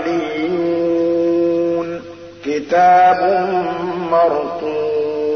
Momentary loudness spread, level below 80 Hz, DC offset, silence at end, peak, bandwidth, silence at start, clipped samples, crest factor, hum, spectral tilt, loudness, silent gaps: 12 LU; -58 dBFS; 0.1%; 0 s; -4 dBFS; 6.4 kHz; 0 s; under 0.1%; 12 dB; none; -6.5 dB/octave; -16 LUFS; none